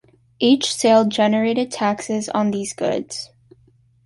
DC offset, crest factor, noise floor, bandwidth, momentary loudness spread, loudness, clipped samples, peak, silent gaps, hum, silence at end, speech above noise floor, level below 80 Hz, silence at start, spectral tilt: under 0.1%; 16 dB; -56 dBFS; 11.5 kHz; 10 LU; -19 LUFS; under 0.1%; -4 dBFS; none; none; 0.8 s; 37 dB; -62 dBFS; 0.4 s; -4 dB/octave